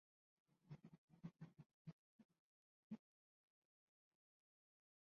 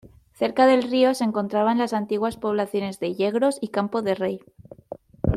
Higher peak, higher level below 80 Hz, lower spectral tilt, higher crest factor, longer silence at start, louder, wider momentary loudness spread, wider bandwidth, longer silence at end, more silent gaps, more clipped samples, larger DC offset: second, -44 dBFS vs -6 dBFS; second, under -90 dBFS vs -44 dBFS; first, -8.5 dB/octave vs -6 dB/octave; about the same, 22 dB vs 18 dB; first, 0.5 s vs 0.05 s; second, -63 LUFS vs -23 LUFS; second, 4 LU vs 10 LU; second, 6.4 kHz vs 14 kHz; first, 2.1 s vs 0 s; first, 0.98-1.08 s, 1.74-1.85 s, 1.93-2.19 s, 2.25-2.29 s, 2.39-2.90 s vs none; neither; neither